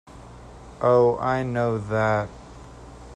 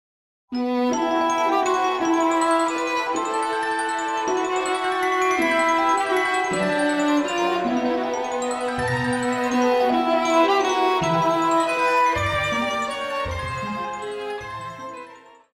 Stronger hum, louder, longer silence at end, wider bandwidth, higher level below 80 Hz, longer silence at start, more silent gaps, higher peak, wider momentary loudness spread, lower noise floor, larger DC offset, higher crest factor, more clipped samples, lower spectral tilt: first, 60 Hz at -40 dBFS vs none; about the same, -22 LUFS vs -22 LUFS; second, 0 s vs 0.35 s; second, 10 kHz vs 16 kHz; about the same, -48 dBFS vs -50 dBFS; second, 0.15 s vs 0.5 s; neither; about the same, -8 dBFS vs -6 dBFS; first, 25 LU vs 9 LU; about the same, -43 dBFS vs -45 dBFS; neither; about the same, 16 dB vs 16 dB; neither; first, -7.5 dB/octave vs -4 dB/octave